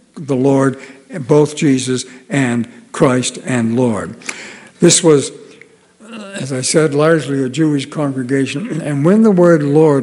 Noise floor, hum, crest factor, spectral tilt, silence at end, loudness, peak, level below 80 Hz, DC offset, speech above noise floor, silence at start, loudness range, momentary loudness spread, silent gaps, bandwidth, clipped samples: -44 dBFS; none; 14 dB; -5 dB/octave; 0 s; -14 LUFS; 0 dBFS; -60 dBFS; under 0.1%; 31 dB; 0.15 s; 3 LU; 16 LU; none; over 20 kHz; 0.2%